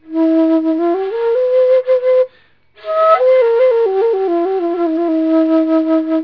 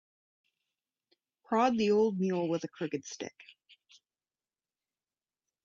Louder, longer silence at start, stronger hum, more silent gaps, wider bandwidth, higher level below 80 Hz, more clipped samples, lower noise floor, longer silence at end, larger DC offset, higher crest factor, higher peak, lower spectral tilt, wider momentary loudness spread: first, -14 LUFS vs -31 LUFS; second, 0.1 s vs 1.5 s; neither; neither; second, 5.4 kHz vs 7.4 kHz; first, -64 dBFS vs -78 dBFS; neither; second, -52 dBFS vs under -90 dBFS; second, 0 s vs 2.35 s; first, 0.2% vs under 0.1%; second, 14 dB vs 20 dB; first, 0 dBFS vs -14 dBFS; about the same, -6.5 dB/octave vs -6 dB/octave; second, 6 LU vs 15 LU